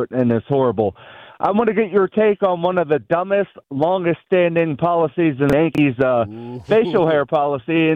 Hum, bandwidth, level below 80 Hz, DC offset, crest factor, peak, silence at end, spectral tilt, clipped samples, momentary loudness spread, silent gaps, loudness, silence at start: none; 8.2 kHz; -52 dBFS; under 0.1%; 14 dB; -4 dBFS; 0 s; -8.5 dB/octave; under 0.1%; 5 LU; none; -18 LUFS; 0 s